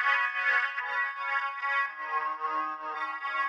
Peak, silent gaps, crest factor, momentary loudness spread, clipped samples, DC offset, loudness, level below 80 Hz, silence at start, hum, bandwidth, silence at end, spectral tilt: -14 dBFS; none; 16 dB; 8 LU; under 0.1%; under 0.1%; -29 LUFS; under -90 dBFS; 0 s; none; 10.5 kHz; 0 s; -0.5 dB/octave